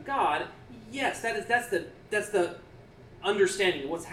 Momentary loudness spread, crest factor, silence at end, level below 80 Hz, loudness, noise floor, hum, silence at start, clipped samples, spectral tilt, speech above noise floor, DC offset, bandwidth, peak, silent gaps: 12 LU; 18 dB; 0 s; -60 dBFS; -29 LUFS; -51 dBFS; none; 0 s; under 0.1%; -3.5 dB/octave; 22 dB; under 0.1%; 15 kHz; -12 dBFS; none